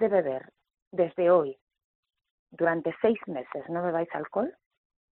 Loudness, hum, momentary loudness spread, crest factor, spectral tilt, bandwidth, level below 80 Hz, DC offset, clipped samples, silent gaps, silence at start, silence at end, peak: -28 LUFS; none; 13 LU; 18 dB; -6 dB/octave; 4.1 kHz; -74 dBFS; under 0.1%; under 0.1%; 0.82-0.91 s, 1.62-1.67 s, 1.85-2.03 s, 2.31-2.46 s; 0 s; 0.65 s; -10 dBFS